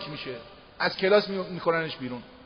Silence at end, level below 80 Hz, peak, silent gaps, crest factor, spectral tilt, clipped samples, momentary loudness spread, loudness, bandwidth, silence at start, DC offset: 0 s; -62 dBFS; -8 dBFS; none; 20 dB; -3 dB/octave; under 0.1%; 15 LU; -27 LUFS; 6.4 kHz; 0 s; under 0.1%